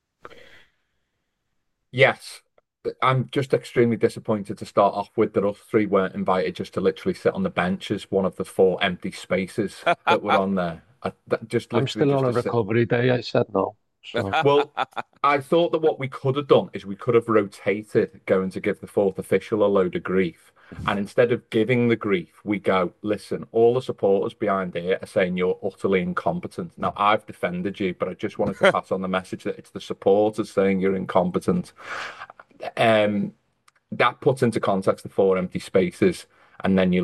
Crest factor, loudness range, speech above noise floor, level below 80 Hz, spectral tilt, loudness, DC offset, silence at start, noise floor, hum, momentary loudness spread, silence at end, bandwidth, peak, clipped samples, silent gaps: 20 dB; 2 LU; 53 dB; -64 dBFS; -6.5 dB/octave; -23 LUFS; under 0.1%; 1.95 s; -76 dBFS; none; 10 LU; 0 s; 12.5 kHz; -2 dBFS; under 0.1%; none